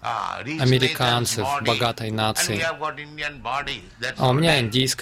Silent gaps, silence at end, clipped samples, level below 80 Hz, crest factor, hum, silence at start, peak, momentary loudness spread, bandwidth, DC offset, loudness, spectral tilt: none; 0 s; under 0.1%; -50 dBFS; 20 dB; none; 0 s; -4 dBFS; 11 LU; 16 kHz; under 0.1%; -22 LUFS; -4 dB/octave